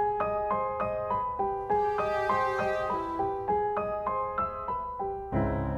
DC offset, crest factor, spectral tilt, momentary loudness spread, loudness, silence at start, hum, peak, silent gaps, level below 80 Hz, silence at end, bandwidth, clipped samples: under 0.1%; 16 dB; -7.5 dB/octave; 5 LU; -30 LUFS; 0 s; none; -14 dBFS; none; -46 dBFS; 0 s; 12 kHz; under 0.1%